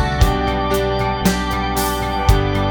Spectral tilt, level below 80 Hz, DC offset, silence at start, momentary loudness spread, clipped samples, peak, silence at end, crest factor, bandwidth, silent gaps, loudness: -5 dB/octave; -22 dBFS; under 0.1%; 0 s; 3 LU; under 0.1%; -2 dBFS; 0 s; 16 dB; over 20 kHz; none; -18 LUFS